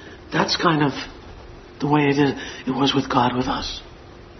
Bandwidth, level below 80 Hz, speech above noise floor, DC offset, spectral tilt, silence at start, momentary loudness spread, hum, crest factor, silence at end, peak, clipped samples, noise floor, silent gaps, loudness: 6.4 kHz; -46 dBFS; 22 dB; under 0.1%; -5.5 dB/octave; 0 s; 17 LU; none; 20 dB; 0 s; -2 dBFS; under 0.1%; -42 dBFS; none; -21 LUFS